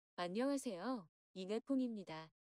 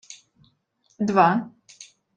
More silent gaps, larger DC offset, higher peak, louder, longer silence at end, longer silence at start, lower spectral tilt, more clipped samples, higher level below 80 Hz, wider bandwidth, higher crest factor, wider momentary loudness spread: first, 1.09-1.34 s vs none; neither; second, -30 dBFS vs -4 dBFS; second, -43 LUFS vs -21 LUFS; about the same, 0.25 s vs 0.35 s; about the same, 0.2 s vs 0.1 s; about the same, -5 dB/octave vs -6 dB/octave; neither; second, -88 dBFS vs -70 dBFS; first, 14.5 kHz vs 9.2 kHz; second, 14 dB vs 22 dB; second, 12 LU vs 26 LU